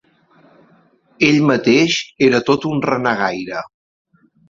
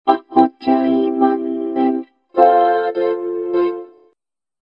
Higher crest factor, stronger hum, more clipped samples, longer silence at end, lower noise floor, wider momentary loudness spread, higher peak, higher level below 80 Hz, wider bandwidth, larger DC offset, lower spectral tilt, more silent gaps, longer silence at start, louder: about the same, 16 dB vs 16 dB; neither; neither; about the same, 0.8 s vs 0.75 s; second, -54 dBFS vs -70 dBFS; first, 12 LU vs 9 LU; about the same, -2 dBFS vs 0 dBFS; first, -56 dBFS vs -64 dBFS; first, 7.6 kHz vs 5.4 kHz; neither; second, -5 dB/octave vs -8 dB/octave; neither; first, 1.2 s vs 0.05 s; about the same, -16 LUFS vs -17 LUFS